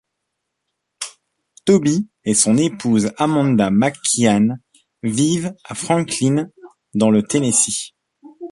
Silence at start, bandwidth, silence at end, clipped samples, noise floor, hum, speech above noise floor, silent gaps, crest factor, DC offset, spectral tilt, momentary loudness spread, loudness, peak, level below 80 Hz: 1 s; 11.5 kHz; 0 s; under 0.1%; -77 dBFS; none; 60 dB; none; 18 dB; under 0.1%; -4.5 dB/octave; 16 LU; -17 LUFS; 0 dBFS; -56 dBFS